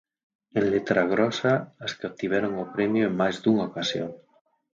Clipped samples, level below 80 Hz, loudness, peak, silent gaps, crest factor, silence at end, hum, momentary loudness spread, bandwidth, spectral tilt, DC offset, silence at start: under 0.1%; -62 dBFS; -26 LUFS; -8 dBFS; none; 18 dB; 0.55 s; none; 10 LU; 7.6 kHz; -6 dB/octave; under 0.1%; 0.55 s